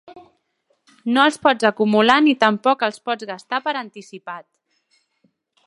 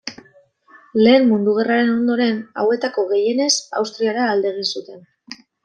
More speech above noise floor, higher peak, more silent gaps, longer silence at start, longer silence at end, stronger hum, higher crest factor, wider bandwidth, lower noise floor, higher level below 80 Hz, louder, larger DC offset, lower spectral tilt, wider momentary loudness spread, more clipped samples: first, 50 dB vs 35 dB; about the same, 0 dBFS vs -2 dBFS; neither; about the same, 0.1 s vs 0.05 s; first, 1.25 s vs 0.3 s; neither; about the same, 20 dB vs 16 dB; first, 11.5 kHz vs 9.8 kHz; first, -68 dBFS vs -53 dBFS; about the same, -70 dBFS vs -66 dBFS; about the same, -18 LUFS vs -18 LUFS; neither; about the same, -4.5 dB/octave vs -3.5 dB/octave; first, 20 LU vs 14 LU; neither